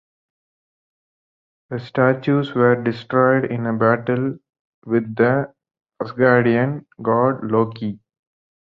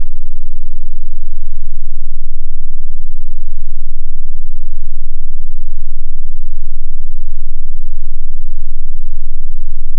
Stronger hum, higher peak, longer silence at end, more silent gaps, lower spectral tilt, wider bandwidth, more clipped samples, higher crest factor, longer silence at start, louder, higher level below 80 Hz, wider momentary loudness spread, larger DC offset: neither; about the same, -2 dBFS vs 0 dBFS; first, 0.7 s vs 0 s; first, 4.59-4.82 s vs none; second, -10 dB/octave vs -14.5 dB/octave; first, 5.6 kHz vs 0.1 kHz; neither; first, 18 dB vs 4 dB; first, 1.7 s vs 0 s; first, -19 LUFS vs -27 LUFS; second, -62 dBFS vs -12 dBFS; first, 14 LU vs 1 LU; neither